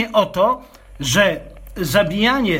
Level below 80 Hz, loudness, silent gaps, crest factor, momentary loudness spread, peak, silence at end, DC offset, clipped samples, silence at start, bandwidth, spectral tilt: -40 dBFS; -18 LUFS; none; 16 dB; 11 LU; -2 dBFS; 0 s; under 0.1%; under 0.1%; 0 s; 16.5 kHz; -4 dB/octave